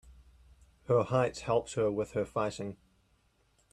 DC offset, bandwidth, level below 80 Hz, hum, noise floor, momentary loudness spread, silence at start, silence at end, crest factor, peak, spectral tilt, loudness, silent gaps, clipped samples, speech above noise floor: under 0.1%; 11.5 kHz; -60 dBFS; none; -70 dBFS; 8 LU; 0.05 s; 1 s; 20 dB; -14 dBFS; -6 dB/octave; -32 LUFS; none; under 0.1%; 39 dB